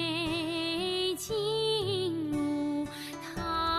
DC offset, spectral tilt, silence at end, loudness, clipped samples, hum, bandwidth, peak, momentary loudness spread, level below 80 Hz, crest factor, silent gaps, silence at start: under 0.1%; -4.5 dB/octave; 0 s; -31 LUFS; under 0.1%; none; 13.5 kHz; -18 dBFS; 7 LU; -54 dBFS; 12 dB; none; 0 s